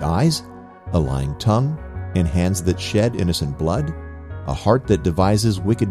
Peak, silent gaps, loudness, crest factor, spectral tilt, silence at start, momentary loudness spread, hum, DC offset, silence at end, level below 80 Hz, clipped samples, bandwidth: -2 dBFS; none; -20 LUFS; 18 dB; -6.5 dB/octave; 0 s; 11 LU; none; under 0.1%; 0 s; -34 dBFS; under 0.1%; 15 kHz